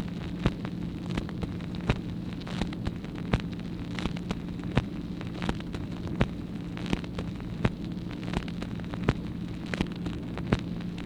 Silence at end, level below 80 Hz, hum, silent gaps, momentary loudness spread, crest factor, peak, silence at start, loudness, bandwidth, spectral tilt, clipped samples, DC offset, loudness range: 0 s; -42 dBFS; none; none; 6 LU; 26 dB; -6 dBFS; 0 s; -33 LUFS; 11.5 kHz; -7 dB/octave; under 0.1%; under 0.1%; 1 LU